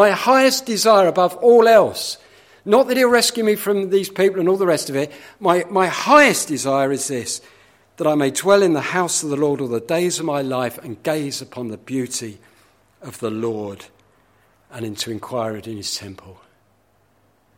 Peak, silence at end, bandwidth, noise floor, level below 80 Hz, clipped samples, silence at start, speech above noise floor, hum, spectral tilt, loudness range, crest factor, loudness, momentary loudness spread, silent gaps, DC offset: 0 dBFS; 1.25 s; 16.5 kHz; -60 dBFS; -64 dBFS; under 0.1%; 0 s; 42 dB; none; -3.5 dB/octave; 14 LU; 18 dB; -18 LUFS; 15 LU; none; under 0.1%